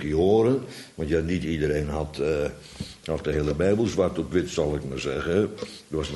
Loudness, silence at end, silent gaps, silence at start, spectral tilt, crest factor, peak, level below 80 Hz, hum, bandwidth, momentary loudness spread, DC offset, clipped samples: -26 LUFS; 0 s; none; 0 s; -6.5 dB/octave; 16 dB; -10 dBFS; -40 dBFS; none; 11.5 kHz; 12 LU; under 0.1%; under 0.1%